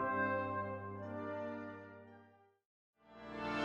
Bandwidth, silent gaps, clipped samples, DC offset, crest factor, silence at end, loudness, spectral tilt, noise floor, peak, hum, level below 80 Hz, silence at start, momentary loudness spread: 9.4 kHz; 2.65-2.93 s; under 0.1%; under 0.1%; 18 dB; 0 s; -42 LUFS; -7 dB/octave; -66 dBFS; -24 dBFS; none; -72 dBFS; 0 s; 22 LU